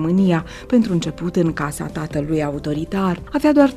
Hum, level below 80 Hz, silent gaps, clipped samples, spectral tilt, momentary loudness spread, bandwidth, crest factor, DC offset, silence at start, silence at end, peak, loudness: none; -40 dBFS; none; under 0.1%; -7 dB/octave; 8 LU; 14 kHz; 16 dB; under 0.1%; 0 s; 0 s; -2 dBFS; -20 LUFS